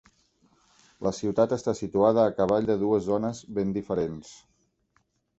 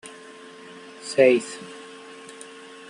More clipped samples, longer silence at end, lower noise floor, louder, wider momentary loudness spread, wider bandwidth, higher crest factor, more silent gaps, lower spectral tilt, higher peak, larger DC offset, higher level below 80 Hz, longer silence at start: neither; about the same, 1.05 s vs 1.15 s; first, -71 dBFS vs -44 dBFS; second, -26 LUFS vs -20 LUFS; second, 9 LU vs 25 LU; second, 8.2 kHz vs 11.5 kHz; about the same, 20 dB vs 22 dB; neither; first, -7 dB/octave vs -4 dB/octave; second, -8 dBFS vs -4 dBFS; neither; first, -58 dBFS vs -76 dBFS; about the same, 1 s vs 1.05 s